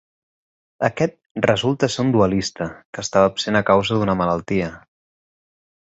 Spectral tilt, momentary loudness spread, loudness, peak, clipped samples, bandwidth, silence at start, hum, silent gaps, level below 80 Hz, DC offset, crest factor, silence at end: -5.5 dB/octave; 9 LU; -20 LUFS; -2 dBFS; under 0.1%; 8.2 kHz; 0.8 s; none; 1.26-1.35 s, 2.85-2.93 s; -48 dBFS; under 0.1%; 20 dB; 1.2 s